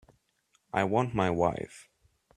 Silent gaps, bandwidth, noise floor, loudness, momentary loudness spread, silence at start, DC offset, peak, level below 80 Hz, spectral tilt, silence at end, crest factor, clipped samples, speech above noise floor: none; 12.5 kHz; -72 dBFS; -29 LUFS; 12 LU; 0.75 s; under 0.1%; -10 dBFS; -58 dBFS; -6.5 dB/octave; 0.55 s; 22 dB; under 0.1%; 44 dB